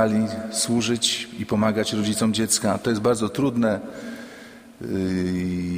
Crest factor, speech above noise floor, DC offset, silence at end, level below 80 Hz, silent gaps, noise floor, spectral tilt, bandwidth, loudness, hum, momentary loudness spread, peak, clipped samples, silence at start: 18 dB; 21 dB; under 0.1%; 0 s; -54 dBFS; none; -43 dBFS; -4 dB/octave; 15.5 kHz; -23 LUFS; none; 15 LU; -4 dBFS; under 0.1%; 0 s